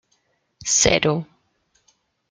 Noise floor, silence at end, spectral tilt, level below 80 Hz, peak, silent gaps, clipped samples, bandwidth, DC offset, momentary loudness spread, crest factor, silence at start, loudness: -68 dBFS; 1.05 s; -2.5 dB/octave; -46 dBFS; -2 dBFS; none; under 0.1%; 10.5 kHz; under 0.1%; 17 LU; 22 dB; 0.6 s; -19 LUFS